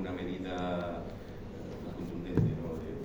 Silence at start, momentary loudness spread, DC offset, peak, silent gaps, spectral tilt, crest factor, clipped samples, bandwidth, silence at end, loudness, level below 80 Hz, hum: 0 s; 13 LU; under 0.1%; -14 dBFS; none; -8 dB/octave; 22 dB; under 0.1%; over 20 kHz; 0 s; -37 LUFS; -50 dBFS; none